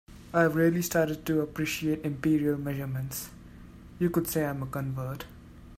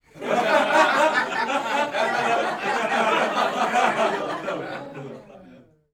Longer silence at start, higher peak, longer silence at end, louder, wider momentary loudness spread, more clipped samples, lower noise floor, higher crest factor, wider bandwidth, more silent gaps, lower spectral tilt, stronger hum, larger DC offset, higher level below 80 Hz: about the same, 0.1 s vs 0.15 s; second, -10 dBFS vs -6 dBFS; second, 0 s vs 0.35 s; second, -29 LUFS vs -22 LUFS; second, 12 LU vs 15 LU; neither; about the same, -48 dBFS vs -50 dBFS; about the same, 20 dB vs 18 dB; second, 16 kHz vs 18.5 kHz; neither; first, -6 dB/octave vs -3 dB/octave; neither; neither; first, -54 dBFS vs -66 dBFS